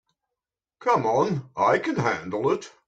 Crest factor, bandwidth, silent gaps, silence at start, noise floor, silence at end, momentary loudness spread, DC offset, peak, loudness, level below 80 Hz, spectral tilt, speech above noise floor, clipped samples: 16 dB; 9 kHz; none; 0.8 s; -88 dBFS; 0.2 s; 5 LU; under 0.1%; -8 dBFS; -24 LUFS; -64 dBFS; -6 dB/octave; 64 dB; under 0.1%